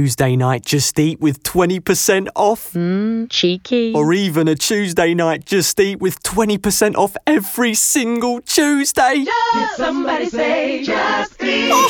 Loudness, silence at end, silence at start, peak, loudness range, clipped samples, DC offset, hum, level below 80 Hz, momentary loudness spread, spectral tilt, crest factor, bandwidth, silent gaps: -16 LUFS; 0 s; 0 s; -2 dBFS; 1 LU; under 0.1%; under 0.1%; none; -48 dBFS; 4 LU; -4 dB/octave; 14 dB; 19 kHz; none